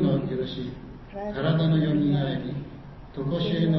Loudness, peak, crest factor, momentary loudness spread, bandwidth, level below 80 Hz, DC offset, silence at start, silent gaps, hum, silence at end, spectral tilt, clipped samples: -26 LUFS; -12 dBFS; 14 dB; 18 LU; 5.8 kHz; -48 dBFS; under 0.1%; 0 s; none; none; 0 s; -9.5 dB/octave; under 0.1%